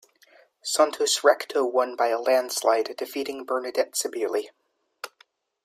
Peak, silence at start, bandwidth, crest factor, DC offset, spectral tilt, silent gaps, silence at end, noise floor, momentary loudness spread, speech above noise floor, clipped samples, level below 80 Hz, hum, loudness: -6 dBFS; 0.65 s; 16 kHz; 20 dB; under 0.1%; 0 dB/octave; none; 0.55 s; -62 dBFS; 18 LU; 38 dB; under 0.1%; -80 dBFS; none; -24 LUFS